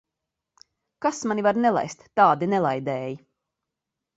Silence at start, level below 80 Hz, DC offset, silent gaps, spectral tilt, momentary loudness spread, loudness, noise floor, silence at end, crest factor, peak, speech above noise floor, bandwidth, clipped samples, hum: 1 s; -68 dBFS; under 0.1%; none; -5.5 dB/octave; 11 LU; -23 LUFS; -85 dBFS; 1 s; 20 dB; -4 dBFS; 62 dB; 8 kHz; under 0.1%; none